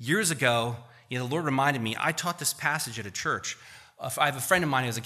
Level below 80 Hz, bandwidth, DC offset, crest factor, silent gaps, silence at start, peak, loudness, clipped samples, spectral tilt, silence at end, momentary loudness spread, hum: -66 dBFS; 15.5 kHz; under 0.1%; 20 dB; none; 0 s; -8 dBFS; -27 LUFS; under 0.1%; -3.5 dB/octave; 0 s; 12 LU; none